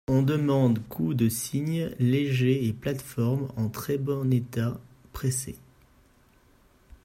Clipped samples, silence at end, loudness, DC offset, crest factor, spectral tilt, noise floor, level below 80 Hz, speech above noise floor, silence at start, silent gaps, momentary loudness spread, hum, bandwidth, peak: under 0.1%; 1.45 s; -27 LUFS; under 0.1%; 16 dB; -6.5 dB/octave; -60 dBFS; -54 dBFS; 34 dB; 0.1 s; none; 8 LU; none; 16 kHz; -12 dBFS